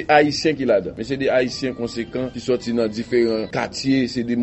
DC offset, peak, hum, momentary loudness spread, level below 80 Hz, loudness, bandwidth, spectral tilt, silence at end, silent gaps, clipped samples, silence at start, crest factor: under 0.1%; -2 dBFS; none; 8 LU; -50 dBFS; -21 LUFS; 8.2 kHz; -5 dB/octave; 0 s; none; under 0.1%; 0 s; 18 dB